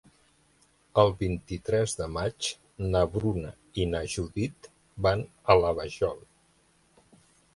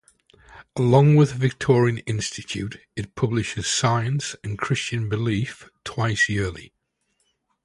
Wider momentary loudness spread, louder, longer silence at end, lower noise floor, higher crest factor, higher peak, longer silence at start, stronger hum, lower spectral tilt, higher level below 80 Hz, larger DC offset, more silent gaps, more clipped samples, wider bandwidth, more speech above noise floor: second, 11 LU vs 16 LU; second, -28 LUFS vs -22 LUFS; first, 1.35 s vs 1 s; second, -65 dBFS vs -72 dBFS; about the same, 24 dB vs 20 dB; second, -6 dBFS vs -2 dBFS; first, 0.95 s vs 0.5 s; neither; about the same, -5.5 dB/octave vs -5.5 dB/octave; about the same, -46 dBFS vs -50 dBFS; neither; neither; neither; about the same, 11.5 kHz vs 11.5 kHz; second, 38 dB vs 50 dB